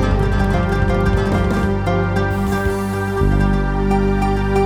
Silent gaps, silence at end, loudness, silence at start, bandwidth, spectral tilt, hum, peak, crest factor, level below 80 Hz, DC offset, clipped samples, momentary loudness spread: none; 0 s; -18 LUFS; 0 s; 16 kHz; -7.5 dB/octave; 50 Hz at -30 dBFS; -4 dBFS; 12 dB; -22 dBFS; under 0.1%; under 0.1%; 2 LU